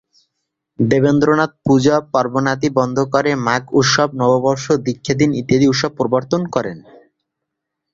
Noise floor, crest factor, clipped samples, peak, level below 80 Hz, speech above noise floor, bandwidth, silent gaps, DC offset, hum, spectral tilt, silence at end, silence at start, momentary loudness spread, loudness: -78 dBFS; 16 dB; under 0.1%; -2 dBFS; -52 dBFS; 63 dB; 7.6 kHz; none; under 0.1%; none; -5.5 dB/octave; 1.15 s; 0.8 s; 5 LU; -16 LUFS